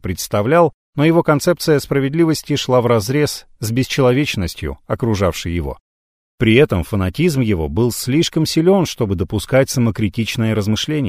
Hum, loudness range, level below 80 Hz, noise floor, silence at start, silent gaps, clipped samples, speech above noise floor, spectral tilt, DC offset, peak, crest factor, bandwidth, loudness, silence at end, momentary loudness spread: none; 3 LU; -38 dBFS; under -90 dBFS; 0.05 s; 0.74-0.93 s, 5.80-6.38 s; under 0.1%; over 74 dB; -5.5 dB/octave; under 0.1%; 0 dBFS; 16 dB; 16 kHz; -17 LUFS; 0 s; 8 LU